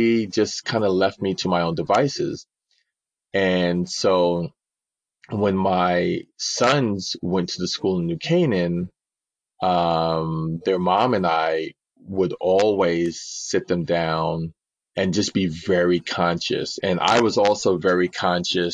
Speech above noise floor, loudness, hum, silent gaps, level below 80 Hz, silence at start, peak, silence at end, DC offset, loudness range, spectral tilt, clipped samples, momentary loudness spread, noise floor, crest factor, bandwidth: 68 dB; -22 LUFS; none; none; -56 dBFS; 0 s; -6 dBFS; 0 s; under 0.1%; 3 LU; -5 dB/octave; under 0.1%; 7 LU; -89 dBFS; 16 dB; 9.6 kHz